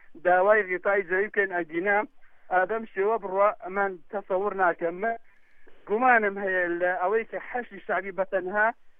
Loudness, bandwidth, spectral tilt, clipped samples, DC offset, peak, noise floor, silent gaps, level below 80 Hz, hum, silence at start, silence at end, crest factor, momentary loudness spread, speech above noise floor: -26 LUFS; 3.8 kHz; -8.5 dB/octave; under 0.1%; under 0.1%; -6 dBFS; -47 dBFS; none; -62 dBFS; none; 0.1 s; 0.1 s; 20 dB; 10 LU; 21 dB